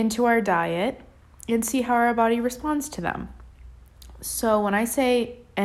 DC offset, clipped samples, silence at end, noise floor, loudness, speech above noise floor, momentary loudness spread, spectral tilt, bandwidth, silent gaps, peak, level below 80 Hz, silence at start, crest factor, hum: under 0.1%; under 0.1%; 0 s; -46 dBFS; -23 LUFS; 23 dB; 12 LU; -4.5 dB/octave; 15.5 kHz; none; -8 dBFS; -48 dBFS; 0 s; 16 dB; none